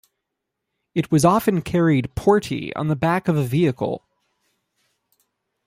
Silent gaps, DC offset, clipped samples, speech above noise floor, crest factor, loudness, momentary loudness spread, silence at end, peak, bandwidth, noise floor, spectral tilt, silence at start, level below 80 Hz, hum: none; under 0.1%; under 0.1%; 61 dB; 18 dB; -20 LUFS; 10 LU; 1.7 s; -4 dBFS; 16 kHz; -80 dBFS; -6.5 dB/octave; 0.95 s; -48 dBFS; none